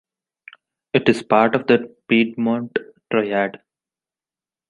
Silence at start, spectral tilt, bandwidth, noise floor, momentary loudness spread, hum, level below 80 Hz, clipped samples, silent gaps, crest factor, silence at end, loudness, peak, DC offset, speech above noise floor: 0.95 s; -6.5 dB/octave; 11 kHz; under -90 dBFS; 8 LU; none; -62 dBFS; under 0.1%; none; 20 dB; 1.15 s; -19 LUFS; -2 dBFS; under 0.1%; over 72 dB